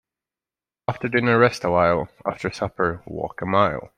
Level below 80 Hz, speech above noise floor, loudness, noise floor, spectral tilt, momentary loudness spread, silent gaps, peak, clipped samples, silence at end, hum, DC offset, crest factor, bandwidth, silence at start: -52 dBFS; over 69 dB; -22 LUFS; under -90 dBFS; -6.5 dB/octave; 12 LU; none; -4 dBFS; under 0.1%; 0.1 s; none; under 0.1%; 20 dB; 12.5 kHz; 0.9 s